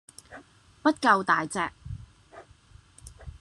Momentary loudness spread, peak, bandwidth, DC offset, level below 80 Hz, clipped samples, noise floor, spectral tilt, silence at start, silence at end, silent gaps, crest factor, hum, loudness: 25 LU; -6 dBFS; 12.5 kHz; under 0.1%; -54 dBFS; under 0.1%; -55 dBFS; -4.5 dB/octave; 0.3 s; 0.05 s; none; 24 dB; none; -25 LUFS